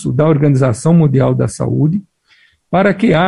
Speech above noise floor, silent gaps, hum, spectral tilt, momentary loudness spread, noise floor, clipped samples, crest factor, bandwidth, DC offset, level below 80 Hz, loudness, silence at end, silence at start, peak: 41 dB; none; none; -7.5 dB/octave; 6 LU; -52 dBFS; under 0.1%; 12 dB; 11.5 kHz; under 0.1%; -44 dBFS; -13 LUFS; 0 s; 0 s; -2 dBFS